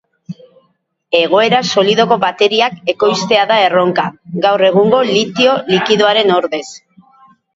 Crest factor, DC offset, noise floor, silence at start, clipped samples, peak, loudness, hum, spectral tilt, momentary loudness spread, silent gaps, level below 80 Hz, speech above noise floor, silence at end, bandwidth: 14 dB; under 0.1%; -62 dBFS; 0.3 s; under 0.1%; 0 dBFS; -12 LUFS; none; -4.5 dB/octave; 11 LU; none; -58 dBFS; 50 dB; 0.8 s; 7.8 kHz